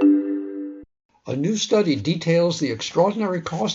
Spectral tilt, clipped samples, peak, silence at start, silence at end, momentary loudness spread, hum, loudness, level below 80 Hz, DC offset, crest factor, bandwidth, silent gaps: -5.5 dB/octave; under 0.1%; -6 dBFS; 0 s; 0 s; 12 LU; none; -22 LUFS; -62 dBFS; under 0.1%; 16 dB; 7.8 kHz; 1.05-1.09 s